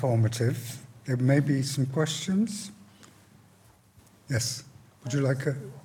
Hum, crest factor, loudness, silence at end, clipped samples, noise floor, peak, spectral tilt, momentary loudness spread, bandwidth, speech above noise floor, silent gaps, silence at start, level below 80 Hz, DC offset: none; 18 dB; -28 LUFS; 0.05 s; under 0.1%; -59 dBFS; -10 dBFS; -5.5 dB/octave; 14 LU; 17.5 kHz; 32 dB; none; 0 s; -66 dBFS; under 0.1%